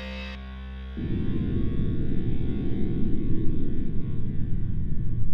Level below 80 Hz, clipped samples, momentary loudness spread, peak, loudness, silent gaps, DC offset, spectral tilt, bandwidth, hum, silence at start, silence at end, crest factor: -30 dBFS; under 0.1%; 8 LU; -10 dBFS; -31 LUFS; none; under 0.1%; -10 dB/octave; 4.8 kHz; none; 0 s; 0 s; 12 dB